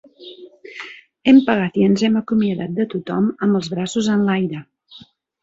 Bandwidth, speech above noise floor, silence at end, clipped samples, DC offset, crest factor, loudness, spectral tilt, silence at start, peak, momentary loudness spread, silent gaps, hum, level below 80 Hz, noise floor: 7.8 kHz; 29 dB; 0.45 s; under 0.1%; under 0.1%; 16 dB; -18 LUFS; -6.5 dB/octave; 0.2 s; -2 dBFS; 21 LU; none; none; -58 dBFS; -46 dBFS